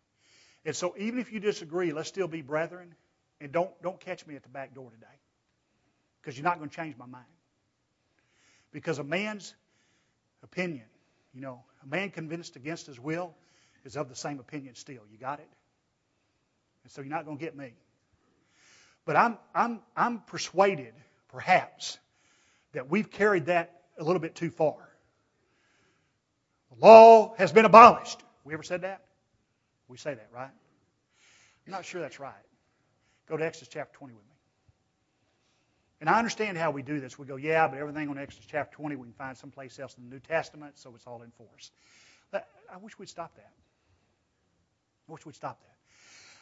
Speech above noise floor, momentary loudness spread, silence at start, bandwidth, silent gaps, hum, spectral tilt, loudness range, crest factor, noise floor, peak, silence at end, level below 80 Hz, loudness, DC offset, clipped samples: 50 dB; 20 LU; 0.65 s; 8 kHz; none; none; -5 dB/octave; 24 LU; 28 dB; -76 dBFS; 0 dBFS; 0.9 s; -72 dBFS; -24 LUFS; under 0.1%; under 0.1%